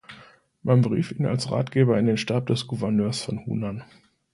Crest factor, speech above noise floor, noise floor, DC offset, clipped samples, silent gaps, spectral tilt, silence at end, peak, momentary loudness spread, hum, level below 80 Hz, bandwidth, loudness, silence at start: 18 dB; 29 dB; -52 dBFS; under 0.1%; under 0.1%; none; -7 dB/octave; 0.5 s; -6 dBFS; 9 LU; none; -58 dBFS; 11.5 kHz; -24 LUFS; 0.1 s